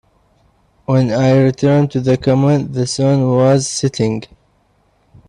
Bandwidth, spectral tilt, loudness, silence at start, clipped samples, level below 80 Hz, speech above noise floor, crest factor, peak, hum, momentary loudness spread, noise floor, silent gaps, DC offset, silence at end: 11 kHz; -6.5 dB/octave; -14 LUFS; 0.9 s; under 0.1%; -48 dBFS; 44 dB; 14 dB; -2 dBFS; none; 7 LU; -57 dBFS; none; under 0.1%; 1.05 s